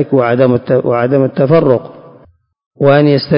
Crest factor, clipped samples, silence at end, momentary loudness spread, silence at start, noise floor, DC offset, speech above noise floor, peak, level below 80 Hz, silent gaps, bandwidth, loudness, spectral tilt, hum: 12 dB; under 0.1%; 0 s; 4 LU; 0 s; -47 dBFS; under 0.1%; 36 dB; 0 dBFS; -50 dBFS; 2.66-2.71 s; 5.4 kHz; -11 LUFS; -12.5 dB/octave; none